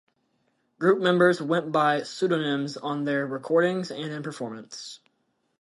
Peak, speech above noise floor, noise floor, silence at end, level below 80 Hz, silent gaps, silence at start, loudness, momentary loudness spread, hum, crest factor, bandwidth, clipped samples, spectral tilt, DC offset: -6 dBFS; 48 dB; -73 dBFS; 0.65 s; -76 dBFS; none; 0.8 s; -25 LUFS; 15 LU; none; 20 dB; 11.5 kHz; under 0.1%; -5.5 dB/octave; under 0.1%